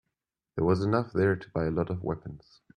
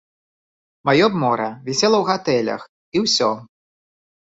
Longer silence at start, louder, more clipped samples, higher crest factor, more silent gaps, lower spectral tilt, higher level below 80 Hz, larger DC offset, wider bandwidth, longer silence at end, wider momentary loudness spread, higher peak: second, 0.55 s vs 0.85 s; second, -29 LUFS vs -19 LUFS; neither; about the same, 18 dB vs 18 dB; second, none vs 2.69-2.92 s; first, -9 dB/octave vs -4 dB/octave; first, -54 dBFS vs -62 dBFS; neither; first, 9.8 kHz vs 8 kHz; second, 0.4 s vs 0.8 s; about the same, 12 LU vs 10 LU; second, -10 dBFS vs -2 dBFS